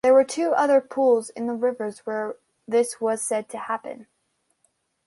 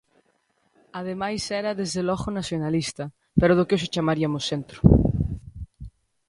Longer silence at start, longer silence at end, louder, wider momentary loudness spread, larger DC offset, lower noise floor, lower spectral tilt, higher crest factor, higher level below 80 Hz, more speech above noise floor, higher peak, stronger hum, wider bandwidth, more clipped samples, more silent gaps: second, 0.05 s vs 0.95 s; first, 1.05 s vs 0.4 s; about the same, -24 LUFS vs -24 LUFS; second, 12 LU vs 17 LU; neither; first, -72 dBFS vs -68 dBFS; second, -3.5 dB/octave vs -6 dB/octave; second, 16 dB vs 24 dB; second, -72 dBFS vs -36 dBFS; first, 49 dB vs 45 dB; second, -8 dBFS vs 0 dBFS; neither; about the same, 11.5 kHz vs 11.5 kHz; neither; neither